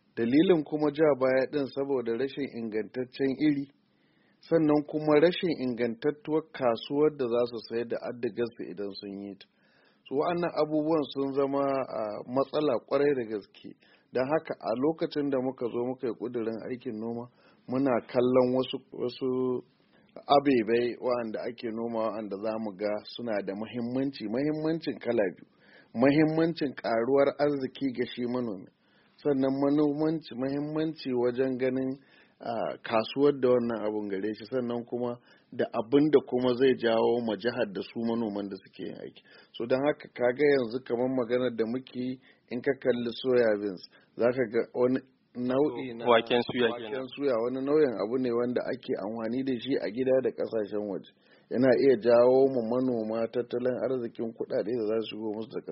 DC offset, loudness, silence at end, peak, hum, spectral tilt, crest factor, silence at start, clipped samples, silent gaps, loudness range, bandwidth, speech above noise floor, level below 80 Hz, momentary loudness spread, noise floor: under 0.1%; -29 LUFS; 0 s; -8 dBFS; none; -5 dB/octave; 20 dB; 0.15 s; under 0.1%; none; 5 LU; 5.8 kHz; 39 dB; -70 dBFS; 12 LU; -67 dBFS